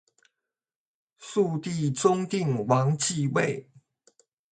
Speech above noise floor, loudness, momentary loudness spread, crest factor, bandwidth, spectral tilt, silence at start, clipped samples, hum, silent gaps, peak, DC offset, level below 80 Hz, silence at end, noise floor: 64 dB; -26 LUFS; 7 LU; 20 dB; 9.4 kHz; -5.5 dB/octave; 1.2 s; under 0.1%; none; none; -8 dBFS; under 0.1%; -68 dBFS; 0.9 s; -90 dBFS